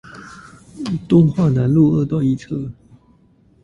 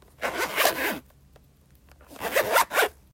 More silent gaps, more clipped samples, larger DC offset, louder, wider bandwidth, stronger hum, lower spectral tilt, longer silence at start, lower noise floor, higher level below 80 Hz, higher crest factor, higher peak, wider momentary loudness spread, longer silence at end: neither; neither; neither; first, -17 LUFS vs -25 LUFS; second, 10.5 kHz vs 16.5 kHz; neither; first, -9.5 dB/octave vs -1 dB/octave; second, 0.05 s vs 0.2 s; second, -53 dBFS vs -57 dBFS; first, -46 dBFS vs -58 dBFS; about the same, 18 dB vs 22 dB; first, -2 dBFS vs -6 dBFS; first, 21 LU vs 11 LU; first, 0.9 s vs 0.2 s